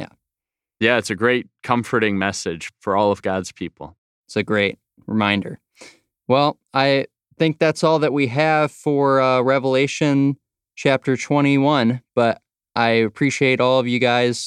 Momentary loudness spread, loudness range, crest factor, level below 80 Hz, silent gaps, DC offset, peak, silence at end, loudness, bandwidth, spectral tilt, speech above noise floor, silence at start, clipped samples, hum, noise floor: 12 LU; 5 LU; 18 dB; -62 dBFS; 3.98-4.24 s; under 0.1%; -2 dBFS; 0 s; -19 LUFS; 12 kHz; -5.5 dB/octave; 70 dB; 0 s; under 0.1%; none; -89 dBFS